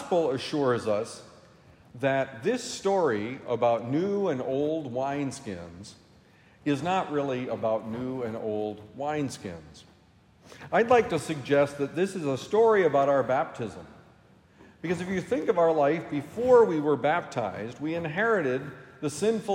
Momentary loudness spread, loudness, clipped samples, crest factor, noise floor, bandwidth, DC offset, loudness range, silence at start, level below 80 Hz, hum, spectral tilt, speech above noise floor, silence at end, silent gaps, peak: 14 LU; -27 LUFS; under 0.1%; 18 dB; -59 dBFS; 14.5 kHz; under 0.1%; 6 LU; 0 s; -66 dBFS; none; -6 dB/octave; 32 dB; 0 s; none; -8 dBFS